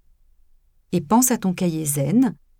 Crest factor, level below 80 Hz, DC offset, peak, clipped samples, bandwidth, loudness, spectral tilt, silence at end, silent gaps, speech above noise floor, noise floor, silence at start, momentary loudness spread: 16 dB; -54 dBFS; under 0.1%; -6 dBFS; under 0.1%; 17.5 kHz; -20 LUFS; -5.5 dB/octave; 0.3 s; none; 36 dB; -56 dBFS; 0.9 s; 7 LU